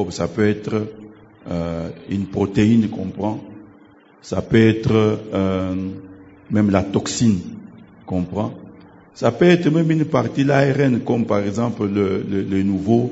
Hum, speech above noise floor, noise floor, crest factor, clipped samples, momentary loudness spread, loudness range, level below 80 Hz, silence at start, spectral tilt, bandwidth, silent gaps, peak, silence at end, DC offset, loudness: none; 30 dB; -49 dBFS; 18 dB; under 0.1%; 12 LU; 4 LU; -50 dBFS; 0 s; -7 dB/octave; 8 kHz; none; 0 dBFS; 0 s; under 0.1%; -19 LUFS